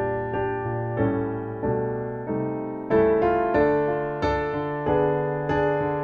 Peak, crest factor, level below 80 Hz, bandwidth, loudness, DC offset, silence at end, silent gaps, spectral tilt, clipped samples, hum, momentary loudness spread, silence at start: -8 dBFS; 16 dB; -44 dBFS; 6.6 kHz; -24 LUFS; under 0.1%; 0 s; none; -9 dB/octave; under 0.1%; none; 8 LU; 0 s